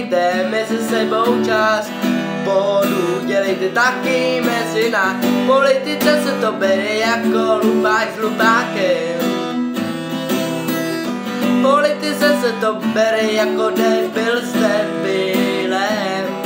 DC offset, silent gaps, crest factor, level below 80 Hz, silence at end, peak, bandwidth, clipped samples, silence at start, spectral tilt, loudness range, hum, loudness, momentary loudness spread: under 0.1%; none; 16 dB; -68 dBFS; 0 s; -2 dBFS; 16.5 kHz; under 0.1%; 0 s; -4.5 dB/octave; 2 LU; none; -17 LUFS; 6 LU